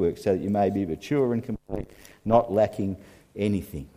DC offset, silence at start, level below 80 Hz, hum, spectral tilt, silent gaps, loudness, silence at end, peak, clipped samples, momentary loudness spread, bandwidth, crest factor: under 0.1%; 0 s; -50 dBFS; none; -8 dB/octave; none; -26 LUFS; 0.1 s; -4 dBFS; under 0.1%; 14 LU; 15.5 kHz; 20 dB